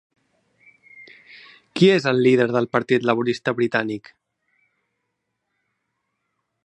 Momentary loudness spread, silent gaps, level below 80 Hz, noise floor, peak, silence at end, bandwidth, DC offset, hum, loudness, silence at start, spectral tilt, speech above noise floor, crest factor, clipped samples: 10 LU; none; -70 dBFS; -77 dBFS; -2 dBFS; 2.65 s; 9.6 kHz; under 0.1%; none; -19 LUFS; 1 s; -6.5 dB/octave; 58 dB; 22 dB; under 0.1%